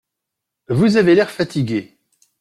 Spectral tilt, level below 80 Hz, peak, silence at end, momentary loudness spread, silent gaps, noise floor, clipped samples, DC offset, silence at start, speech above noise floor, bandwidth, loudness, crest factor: -7 dB/octave; -54 dBFS; -2 dBFS; 0.6 s; 10 LU; none; -81 dBFS; under 0.1%; under 0.1%; 0.7 s; 65 dB; 13 kHz; -17 LUFS; 16 dB